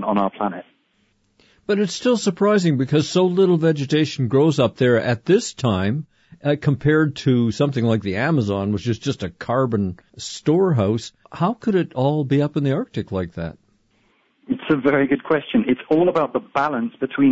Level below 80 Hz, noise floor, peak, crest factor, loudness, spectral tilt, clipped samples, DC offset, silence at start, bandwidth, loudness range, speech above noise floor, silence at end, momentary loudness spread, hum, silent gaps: -54 dBFS; -64 dBFS; -6 dBFS; 14 dB; -20 LUFS; -6.5 dB/octave; under 0.1%; under 0.1%; 0 s; 8 kHz; 4 LU; 45 dB; 0 s; 9 LU; none; none